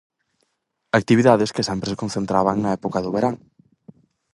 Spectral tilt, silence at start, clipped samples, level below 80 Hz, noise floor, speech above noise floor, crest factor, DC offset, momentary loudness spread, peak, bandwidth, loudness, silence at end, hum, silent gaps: -6 dB/octave; 0.95 s; under 0.1%; -54 dBFS; -73 dBFS; 54 dB; 22 dB; under 0.1%; 10 LU; 0 dBFS; 11.5 kHz; -20 LUFS; 1 s; none; none